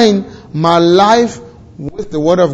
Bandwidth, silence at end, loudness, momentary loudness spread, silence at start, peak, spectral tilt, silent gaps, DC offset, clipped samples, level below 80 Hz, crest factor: 8.2 kHz; 0 s; -11 LUFS; 18 LU; 0 s; 0 dBFS; -5.5 dB/octave; none; under 0.1%; 0.3%; -44 dBFS; 12 dB